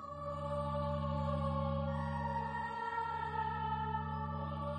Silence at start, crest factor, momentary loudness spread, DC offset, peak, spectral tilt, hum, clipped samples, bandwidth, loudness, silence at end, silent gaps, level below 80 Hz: 0 s; 12 dB; 4 LU; under 0.1%; -26 dBFS; -8 dB/octave; none; under 0.1%; 9.2 kHz; -38 LUFS; 0 s; none; -50 dBFS